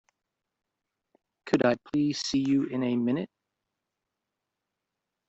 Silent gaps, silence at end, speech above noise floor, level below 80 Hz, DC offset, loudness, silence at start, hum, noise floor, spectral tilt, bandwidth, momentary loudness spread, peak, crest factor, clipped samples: none; 2 s; 59 dB; -66 dBFS; under 0.1%; -27 LUFS; 1.45 s; none; -86 dBFS; -5.5 dB/octave; 8 kHz; 5 LU; -10 dBFS; 22 dB; under 0.1%